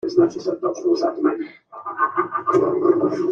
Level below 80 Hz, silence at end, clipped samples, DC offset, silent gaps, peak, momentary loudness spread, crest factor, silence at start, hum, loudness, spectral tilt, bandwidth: -66 dBFS; 0 s; under 0.1%; under 0.1%; none; -4 dBFS; 12 LU; 16 dB; 0.05 s; none; -20 LUFS; -6.5 dB/octave; 7 kHz